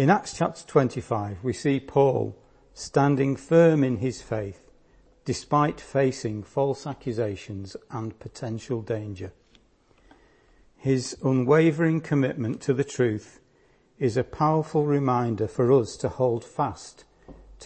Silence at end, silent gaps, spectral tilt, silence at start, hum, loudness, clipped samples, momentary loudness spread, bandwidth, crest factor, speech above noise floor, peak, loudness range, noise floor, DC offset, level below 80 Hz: 0 s; none; -7 dB/octave; 0 s; none; -25 LUFS; under 0.1%; 14 LU; 8.8 kHz; 20 dB; 37 dB; -6 dBFS; 9 LU; -61 dBFS; under 0.1%; -56 dBFS